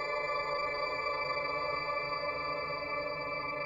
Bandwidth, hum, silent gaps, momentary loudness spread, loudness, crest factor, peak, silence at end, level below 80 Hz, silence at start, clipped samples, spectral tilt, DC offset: 17 kHz; none; none; 2 LU; -34 LUFS; 14 dB; -22 dBFS; 0 s; -60 dBFS; 0 s; under 0.1%; -4.5 dB/octave; under 0.1%